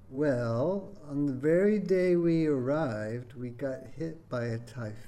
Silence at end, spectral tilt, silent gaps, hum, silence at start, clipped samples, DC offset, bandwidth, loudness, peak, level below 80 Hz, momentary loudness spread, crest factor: 0 s; -8.5 dB/octave; none; none; 0 s; under 0.1%; under 0.1%; 11.5 kHz; -30 LUFS; -16 dBFS; -58 dBFS; 13 LU; 14 dB